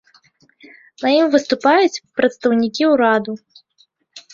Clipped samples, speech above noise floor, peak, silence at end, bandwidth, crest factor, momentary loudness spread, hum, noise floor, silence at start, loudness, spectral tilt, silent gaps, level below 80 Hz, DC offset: under 0.1%; 44 dB; -2 dBFS; 0.15 s; 7.6 kHz; 16 dB; 7 LU; none; -59 dBFS; 1 s; -16 LUFS; -4 dB/octave; none; -64 dBFS; under 0.1%